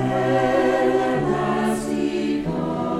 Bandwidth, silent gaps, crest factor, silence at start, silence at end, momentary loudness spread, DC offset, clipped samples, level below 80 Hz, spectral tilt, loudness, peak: 14.5 kHz; none; 14 dB; 0 s; 0 s; 5 LU; under 0.1%; under 0.1%; -46 dBFS; -6.5 dB/octave; -21 LUFS; -8 dBFS